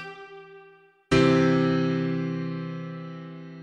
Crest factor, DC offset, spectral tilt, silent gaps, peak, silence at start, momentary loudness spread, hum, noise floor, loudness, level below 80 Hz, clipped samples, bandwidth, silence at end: 18 dB; under 0.1%; -7 dB/octave; none; -8 dBFS; 0 s; 21 LU; none; -54 dBFS; -24 LUFS; -52 dBFS; under 0.1%; 10 kHz; 0 s